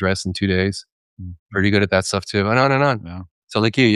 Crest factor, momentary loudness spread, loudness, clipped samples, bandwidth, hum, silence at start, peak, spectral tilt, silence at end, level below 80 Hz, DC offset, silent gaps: 18 dB; 20 LU; -19 LUFS; under 0.1%; 12 kHz; none; 0 s; -2 dBFS; -5.5 dB/octave; 0 s; -50 dBFS; under 0.1%; 0.92-1.17 s, 1.39-1.46 s, 3.31-3.42 s